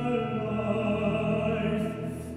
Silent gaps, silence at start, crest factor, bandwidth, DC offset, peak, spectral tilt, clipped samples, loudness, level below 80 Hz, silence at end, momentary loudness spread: none; 0 s; 14 dB; 13.5 kHz; under 0.1%; -14 dBFS; -8 dB/octave; under 0.1%; -29 LUFS; -52 dBFS; 0 s; 4 LU